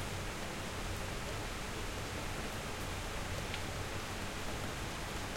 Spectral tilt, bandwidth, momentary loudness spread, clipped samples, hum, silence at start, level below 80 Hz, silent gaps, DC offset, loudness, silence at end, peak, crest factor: -3.5 dB/octave; 16.5 kHz; 1 LU; under 0.1%; none; 0 s; -48 dBFS; none; under 0.1%; -41 LUFS; 0 s; -24 dBFS; 16 dB